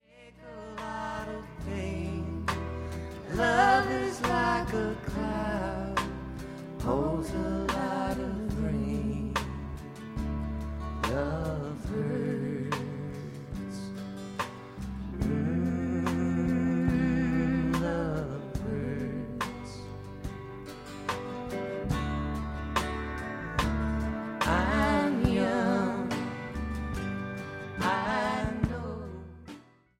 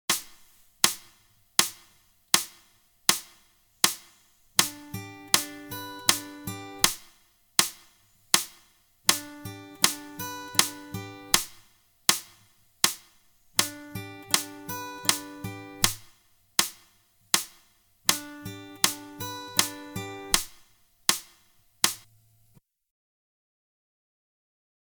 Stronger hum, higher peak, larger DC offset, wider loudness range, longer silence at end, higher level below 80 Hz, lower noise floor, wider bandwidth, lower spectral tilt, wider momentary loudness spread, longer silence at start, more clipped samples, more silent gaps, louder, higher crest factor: neither; second, -10 dBFS vs 0 dBFS; neither; first, 7 LU vs 3 LU; second, 0.4 s vs 2.9 s; first, -42 dBFS vs -58 dBFS; second, -51 dBFS vs -63 dBFS; second, 16 kHz vs 19.5 kHz; first, -6.5 dB/octave vs -0.5 dB/octave; about the same, 13 LU vs 15 LU; about the same, 0.15 s vs 0.1 s; neither; neither; second, -31 LUFS vs -26 LUFS; second, 22 dB vs 32 dB